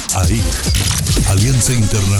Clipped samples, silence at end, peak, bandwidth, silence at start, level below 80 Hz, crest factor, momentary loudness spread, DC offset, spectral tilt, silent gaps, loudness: under 0.1%; 0 s; -4 dBFS; 19.5 kHz; 0 s; -22 dBFS; 10 dB; 3 LU; under 0.1%; -4 dB/octave; none; -14 LUFS